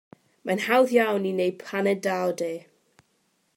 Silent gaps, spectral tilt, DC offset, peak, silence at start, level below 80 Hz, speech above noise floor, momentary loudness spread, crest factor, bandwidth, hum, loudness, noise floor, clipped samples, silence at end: none; -5 dB/octave; under 0.1%; -8 dBFS; 0.45 s; -80 dBFS; 46 dB; 12 LU; 18 dB; 16.5 kHz; none; -24 LUFS; -70 dBFS; under 0.1%; 0.95 s